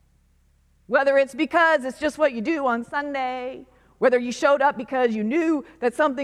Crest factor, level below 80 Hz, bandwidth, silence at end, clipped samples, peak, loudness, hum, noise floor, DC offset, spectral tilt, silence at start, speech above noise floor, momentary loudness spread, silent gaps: 18 dB; -60 dBFS; 12.5 kHz; 0 s; under 0.1%; -6 dBFS; -22 LUFS; none; -61 dBFS; under 0.1%; -4.5 dB/octave; 0.9 s; 39 dB; 8 LU; none